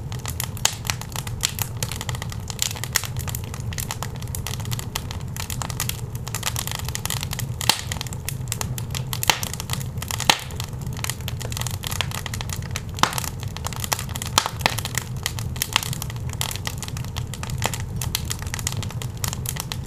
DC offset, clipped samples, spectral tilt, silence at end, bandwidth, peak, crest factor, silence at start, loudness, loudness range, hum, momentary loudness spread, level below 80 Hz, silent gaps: under 0.1%; under 0.1%; -2.5 dB/octave; 0 s; 16 kHz; -2 dBFS; 26 dB; 0 s; -26 LUFS; 3 LU; none; 9 LU; -38 dBFS; none